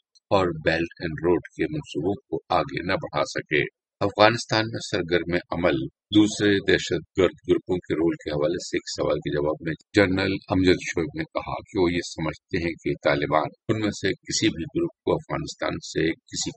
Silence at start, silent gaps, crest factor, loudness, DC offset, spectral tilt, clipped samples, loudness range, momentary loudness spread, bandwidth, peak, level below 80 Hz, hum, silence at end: 0.3 s; none; 24 dB; -25 LUFS; under 0.1%; -5 dB/octave; under 0.1%; 3 LU; 8 LU; 8.8 kHz; 0 dBFS; -50 dBFS; none; 0.05 s